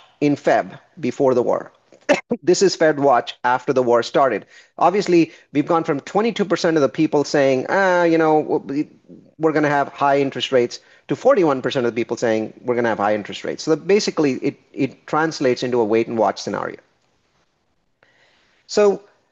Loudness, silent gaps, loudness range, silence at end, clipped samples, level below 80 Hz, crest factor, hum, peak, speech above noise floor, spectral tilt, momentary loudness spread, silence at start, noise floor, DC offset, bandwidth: -19 LUFS; none; 4 LU; 0.35 s; under 0.1%; -68 dBFS; 16 dB; none; -4 dBFS; 49 dB; -5 dB/octave; 10 LU; 0.2 s; -68 dBFS; under 0.1%; 8.2 kHz